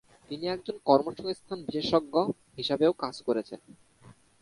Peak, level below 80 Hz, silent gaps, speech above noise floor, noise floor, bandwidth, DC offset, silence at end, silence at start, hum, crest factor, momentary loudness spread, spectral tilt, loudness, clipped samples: -6 dBFS; -66 dBFS; none; 28 dB; -57 dBFS; 11.5 kHz; under 0.1%; 0.3 s; 0.3 s; none; 24 dB; 11 LU; -6 dB/octave; -29 LUFS; under 0.1%